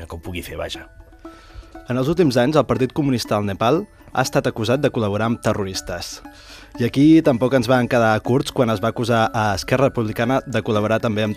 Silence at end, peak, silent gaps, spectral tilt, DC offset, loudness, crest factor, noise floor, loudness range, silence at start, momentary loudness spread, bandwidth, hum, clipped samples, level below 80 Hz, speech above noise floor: 0 s; -2 dBFS; none; -6 dB/octave; under 0.1%; -19 LUFS; 18 dB; -41 dBFS; 4 LU; 0 s; 13 LU; 15 kHz; none; under 0.1%; -44 dBFS; 22 dB